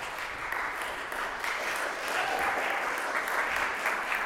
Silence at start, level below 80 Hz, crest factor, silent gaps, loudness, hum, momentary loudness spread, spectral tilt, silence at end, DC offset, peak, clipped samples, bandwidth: 0 s; -58 dBFS; 16 dB; none; -30 LUFS; none; 5 LU; -1 dB/octave; 0 s; under 0.1%; -16 dBFS; under 0.1%; 17 kHz